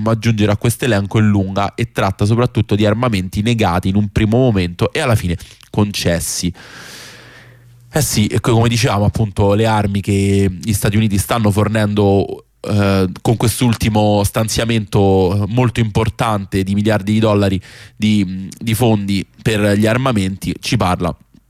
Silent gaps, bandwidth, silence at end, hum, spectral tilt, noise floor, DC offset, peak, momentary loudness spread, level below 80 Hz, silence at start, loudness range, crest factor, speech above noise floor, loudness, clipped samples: none; 15.5 kHz; 0.35 s; none; -6 dB/octave; -43 dBFS; under 0.1%; -4 dBFS; 7 LU; -36 dBFS; 0 s; 3 LU; 12 dB; 28 dB; -15 LUFS; under 0.1%